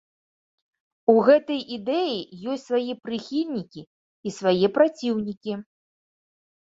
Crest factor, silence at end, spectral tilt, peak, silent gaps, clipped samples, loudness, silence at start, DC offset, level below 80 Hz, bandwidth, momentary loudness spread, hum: 22 dB; 1.05 s; -6 dB/octave; -4 dBFS; 3.87-4.23 s, 5.37-5.41 s; under 0.1%; -24 LUFS; 1.1 s; under 0.1%; -68 dBFS; 8 kHz; 14 LU; none